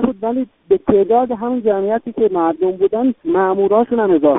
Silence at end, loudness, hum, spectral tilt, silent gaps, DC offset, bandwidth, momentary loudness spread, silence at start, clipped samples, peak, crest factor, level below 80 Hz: 0 s; -16 LUFS; none; -6.5 dB/octave; none; under 0.1%; 3.9 kHz; 6 LU; 0 s; under 0.1%; 0 dBFS; 16 dB; -50 dBFS